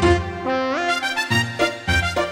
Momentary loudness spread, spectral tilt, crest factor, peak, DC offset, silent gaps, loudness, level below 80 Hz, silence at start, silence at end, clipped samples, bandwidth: 3 LU; -4.5 dB/octave; 16 dB; -4 dBFS; under 0.1%; none; -20 LUFS; -36 dBFS; 0 s; 0 s; under 0.1%; 16 kHz